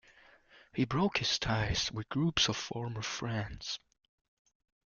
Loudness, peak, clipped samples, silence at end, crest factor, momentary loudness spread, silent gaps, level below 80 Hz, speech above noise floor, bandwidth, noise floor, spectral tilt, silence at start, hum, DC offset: -33 LUFS; -12 dBFS; under 0.1%; 1.15 s; 22 dB; 10 LU; none; -52 dBFS; 28 dB; 7.4 kHz; -62 dBFS; -4 dB/octave; 0.55 s; none; under 0.1%